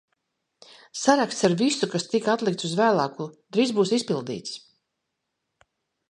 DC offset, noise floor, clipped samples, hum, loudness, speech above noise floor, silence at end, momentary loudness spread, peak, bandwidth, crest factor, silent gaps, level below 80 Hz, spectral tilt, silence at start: under 0.1%; -80 dBFS; under 0.1%; none; -24 LUFS; 57 dB; 1.55 s; 13 LU; -4 dBFS; 11.5 kHz; 22 dB; none; -70 dBFS; -4.5 dB/octave; 0.95 s